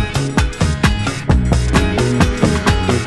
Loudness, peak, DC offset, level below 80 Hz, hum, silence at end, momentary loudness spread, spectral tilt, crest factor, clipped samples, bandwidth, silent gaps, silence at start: -16 LUFS; 0 dBFS; under 0.1%; -20 dBFS; none; 0 s; 3 LU; -5.5 dB/octave; 14 dB; under 0.1%; 12.5 kHz; none; 0 s